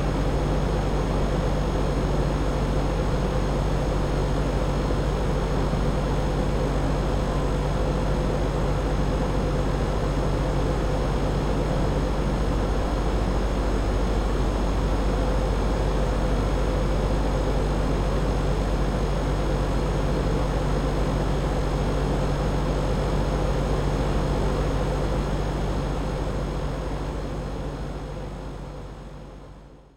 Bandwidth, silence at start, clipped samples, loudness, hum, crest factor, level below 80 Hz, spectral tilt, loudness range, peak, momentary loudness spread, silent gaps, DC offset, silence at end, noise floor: 11 kHz; 0 s; under 0.1%; -26 LUFS; none; 12 dB; -26 dBFS; -7 dB/octave; 2 LU; -12 dBFS; 4 LU; none; under 0.1%; 0.15 s; -45 dBFS